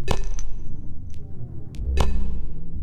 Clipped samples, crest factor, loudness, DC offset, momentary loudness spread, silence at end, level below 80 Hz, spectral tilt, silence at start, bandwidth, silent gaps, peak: under 0.1%; 14 dB; -31 LUFS; under 0.1%; 14 LU; 0 s; -26 dBFS; -5.5 dB/octave; 0 s; 8.4 kHz; none; -6 dBFS